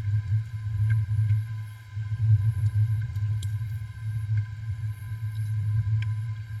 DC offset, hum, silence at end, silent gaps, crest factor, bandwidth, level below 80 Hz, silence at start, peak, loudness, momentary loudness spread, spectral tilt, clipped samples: under 0.1%; none; 0 s; none; 14 dB; 10.5 kHz; -48 dBFS; 0 s; -12 dBFS; -28 LUFS; 10 LU; -7 dB/octave; under 0.1%